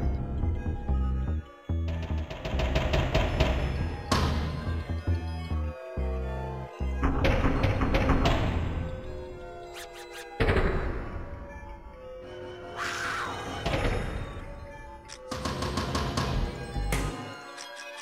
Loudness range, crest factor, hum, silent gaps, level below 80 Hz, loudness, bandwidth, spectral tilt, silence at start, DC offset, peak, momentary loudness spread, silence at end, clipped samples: 5 LU; 20 dB; none; none; -34 dBFS; -31 LUFS; 15 kHz; -6 dB/octave; 0 s; under 0.1%; -10 dBFS; 15 LU; 0 s; under 0.1%